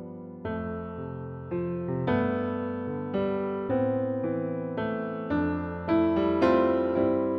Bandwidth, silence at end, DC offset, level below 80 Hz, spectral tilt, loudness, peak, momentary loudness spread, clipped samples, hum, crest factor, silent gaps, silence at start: 5.8 kHz; 0 s; under 0.1%; -54 dBFS; -9.5 dB/octave; -28 LUFS; -10 dBFS; 12 LU; under 0.1%; none; 18 dB; none; 0 s